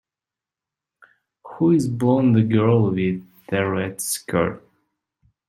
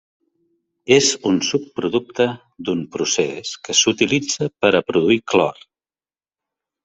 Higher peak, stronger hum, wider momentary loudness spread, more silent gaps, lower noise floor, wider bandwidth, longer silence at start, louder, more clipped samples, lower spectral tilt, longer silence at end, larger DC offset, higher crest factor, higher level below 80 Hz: about the same, -4 dBFS vs -2 dBFS; neither; about the same, 9 LU vs 9 LU; neither; about the same, -89 dBFS vs under -90 dBFS; first, 14 kHz vs 8.4 kHz; first, 1.45 s vs 0.85 s; about the same, -20 LUFS vs -18 LUFS; neither; first, -6.5 dB/octave vs -3 dB/octave; second, 0.9 s vs 1.3 s; neither; about the same, 18 dB vs 18 dB; about the same, -58 dBFS vs -60 dBFS